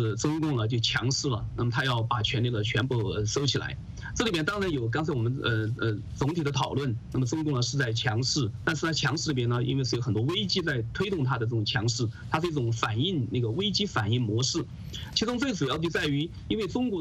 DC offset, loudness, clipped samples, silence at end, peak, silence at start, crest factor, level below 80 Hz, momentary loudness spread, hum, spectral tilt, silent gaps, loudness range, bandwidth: under 0.1%; -28 LUFS; under 0.1%; 0 s; -10 dBFS; 0 s; 18 dB; -48 dBFS; 4 LU; none; -5 dB/octave; none; 1 LU; 10.5 kHz